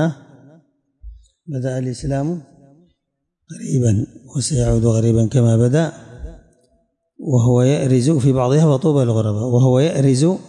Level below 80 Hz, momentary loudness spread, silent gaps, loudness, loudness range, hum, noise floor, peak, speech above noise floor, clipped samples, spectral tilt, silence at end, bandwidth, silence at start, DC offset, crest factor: -40 dBFS; 15 LU; none; -17 LUFS; 10 LU; none; -74 dBFS; -6 dBFS; 59 dB; under 0.1%; -7 dB/octave; 0.05 s; 11 kHz; 0 s; under 0.1%; 12 dB